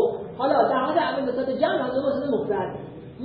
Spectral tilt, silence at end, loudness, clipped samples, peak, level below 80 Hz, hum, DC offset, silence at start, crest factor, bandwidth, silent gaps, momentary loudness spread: -10 dB/octave; 0 s; -24 LUFS; under 0.1%; -8 dBFS; -60 dBFS; none; under 0.1%; 0 s; 16 dB; 5.2 kHz; none; 8 LU